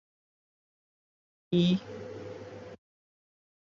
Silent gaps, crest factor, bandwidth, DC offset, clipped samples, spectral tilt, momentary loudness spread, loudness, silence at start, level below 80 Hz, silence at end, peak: none; 20 dB; 7.2 kHz; under 0.1%; under 0.1%; -7.5 dB/octave; 20 LU; -29 LUFS; 1.5 s; -68 dBFS; 1 s; -16 dBFS